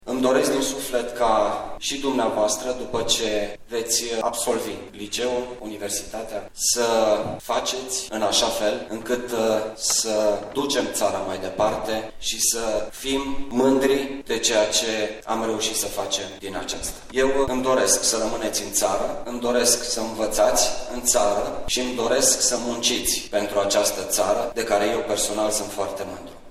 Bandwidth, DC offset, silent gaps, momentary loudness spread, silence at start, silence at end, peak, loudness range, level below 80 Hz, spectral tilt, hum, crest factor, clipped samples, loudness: 16 kHz; under 0.1%; none; 9 LU; 0 s; 0 s; -4 dBFS; 3 LU; -44 dBFS; -1.5 dB/octave; none; 18 dB; under 0.1%; -22 LUFS